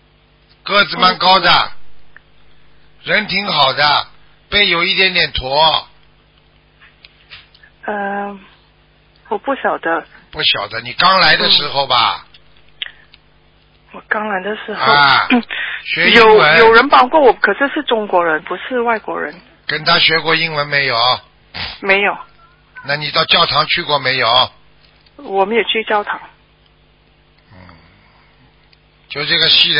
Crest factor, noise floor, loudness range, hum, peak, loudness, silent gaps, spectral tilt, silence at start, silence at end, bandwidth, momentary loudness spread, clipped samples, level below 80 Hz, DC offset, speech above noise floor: 16 dB; -51 dBFS; 11 LU; none; 0 dBFS; -12 LUFS; none; -5 dB/octave; 0.65 s; 0 s; 8 kHz; 16 LU; under 0.1%; -46 dBFS; under 0.1%; 38 dB